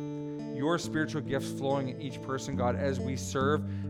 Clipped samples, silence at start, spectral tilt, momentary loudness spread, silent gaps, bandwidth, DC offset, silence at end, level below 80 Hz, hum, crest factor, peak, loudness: under 0.1%; 0 s; -6 dB/octave; 8 LU; none; 16 kHz; under 0.1%; 0 s; -60 dBFS; none; 16 dB; -16 dBFS; -32 LUFS